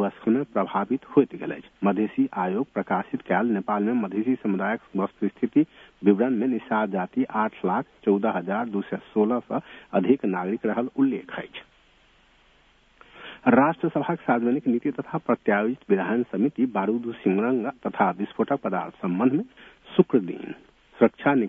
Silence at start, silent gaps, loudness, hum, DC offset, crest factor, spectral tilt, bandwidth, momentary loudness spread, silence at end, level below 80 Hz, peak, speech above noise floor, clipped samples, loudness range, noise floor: 0 s; none; -25 LUFS; none; under 0.1%; 22 dB; -10 dB/octave; 3.8 kHz; 8 LU; 0 s; -66 dBFS; -2 dBFS; 35 dB; under 0.1%; 2 LU; -59 dBFS